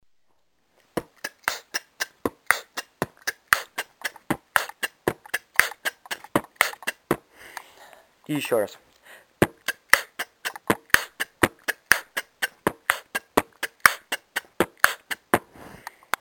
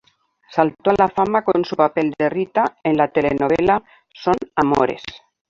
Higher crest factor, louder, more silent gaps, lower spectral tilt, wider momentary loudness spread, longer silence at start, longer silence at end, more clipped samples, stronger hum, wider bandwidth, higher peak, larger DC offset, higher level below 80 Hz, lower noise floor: first, 28 dB vs 18 dB; second, -26 LUFS vs -19 LUFS; neither; second, -2.5 dB/octave vs -7 dB/octave; first, 14 LU vs 5 LU; first, 0.95 s vs 0.5 s; first, 0.5 s vs 0.35 s; neither; neither; first, 17.5 kHz vs 7.6 kHz; about the same, 0 dBFS vs 0 dBFS; neither; second, -56 dBFS vs -50 dBFS; first, -70 dBFS vs -54 dBFS